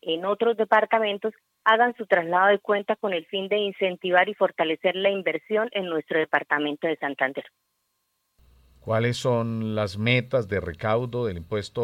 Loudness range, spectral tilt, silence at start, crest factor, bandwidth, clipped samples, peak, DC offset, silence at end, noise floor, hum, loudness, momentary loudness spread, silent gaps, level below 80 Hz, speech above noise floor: 5 LU; -6 dB/octave; 0.05 s; 20 dB; 14.5 kHz; under 0.1%; -4 dBFS; under 0.1%; 0 s; -75 dBFS; none; -24 LUFS; 8 LU; none; -62 dBFS; 51 dB